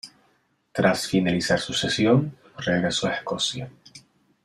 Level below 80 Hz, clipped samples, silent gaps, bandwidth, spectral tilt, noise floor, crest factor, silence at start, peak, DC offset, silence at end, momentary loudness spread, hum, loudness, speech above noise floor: -58 dBFS; under 0.1%; none; 13.5 kHz; -4.5 dB/octave; -66 dBFS; 20 dB; 0.05 s; -6 dBFS; under 0.1%; 0.45 s; 14 LU; none; -23 LUFS; 43 dB